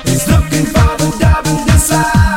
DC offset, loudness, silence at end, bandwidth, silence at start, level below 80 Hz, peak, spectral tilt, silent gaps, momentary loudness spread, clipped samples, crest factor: under 0.1%; -11 LUFS; 0 s; 17 kHz; 0 s; -18 dBFS; 0 dBFS; -5 dB/octave; none; 3 LU; under 0.1%; 10 dB